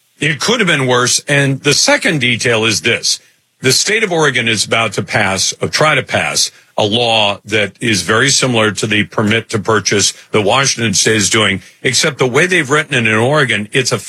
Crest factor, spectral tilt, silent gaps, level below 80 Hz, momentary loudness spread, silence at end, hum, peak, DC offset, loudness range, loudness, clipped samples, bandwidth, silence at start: 14 dB; -3 dB/octave; none; -56 dBFS; 4 LU; 0 s; none; 0 dBFS; under 0.1%; 1 LU; -12 LUFS; under 0.1%; 15.5 kHz; 0.2 s